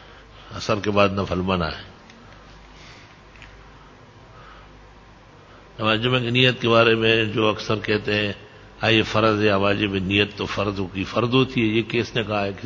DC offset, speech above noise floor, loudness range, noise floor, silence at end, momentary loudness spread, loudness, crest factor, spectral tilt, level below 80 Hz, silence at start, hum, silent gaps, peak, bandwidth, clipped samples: under 0.1%; 27 dB; 9 LU; -47 dBFS; 0 s; 9 LU; -21 LUFS; 22 dB; -6 dB/octave; -46 dBFS; 0 s; none; none; 0 dBFS; 7.6 kHz; under 0.1%